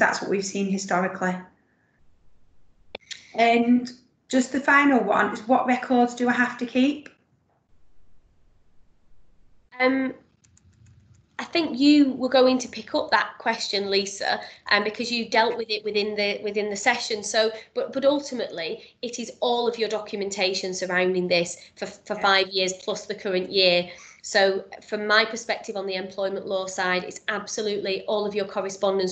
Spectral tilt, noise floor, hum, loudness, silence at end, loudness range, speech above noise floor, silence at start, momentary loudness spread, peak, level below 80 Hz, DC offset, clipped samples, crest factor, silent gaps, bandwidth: -3.5 dB/octave; -66 dBFS; none; -24 LUFS; 0 s; 8 LU; 42 dB; 0 s; 12 LU; -4 dBFS; -66 dBFS; under 0.1%; under 0.1%; 20 dB; none; 9 kHz